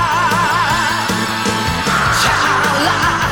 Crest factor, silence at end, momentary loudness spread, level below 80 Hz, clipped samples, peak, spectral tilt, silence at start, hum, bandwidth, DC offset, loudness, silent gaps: 12 dB; 0 s; 4 LU; -34 dBFS; under 0.1%; -2 dBFS; -3 dB/octave; 0 s; none; 19 kHz; 0.4%; -14 LUFS; none